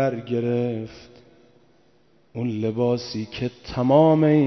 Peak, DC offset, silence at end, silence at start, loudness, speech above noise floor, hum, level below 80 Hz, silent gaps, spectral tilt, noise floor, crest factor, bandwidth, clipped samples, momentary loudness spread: -4 dBFS; under 0.1%; 0 s; 0 s; -22 LUFS; 39 dB; none; -54 dBFS; none; -8 dB/octave; -60 dBFS; 18 dB; 6.4 kHz; under 0.1%; 15 LU